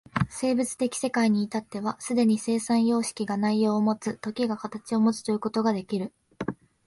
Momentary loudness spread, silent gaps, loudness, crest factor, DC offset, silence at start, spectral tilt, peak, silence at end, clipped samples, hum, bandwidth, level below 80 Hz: 9 LU; none; -27 LUFS; 16 dB; under 0.1%; 0.15 s; -5.5 dB/octave; -10 dBFS; 0.35 s; under 0.1%; none; 11.5 kHz; -60 dBFS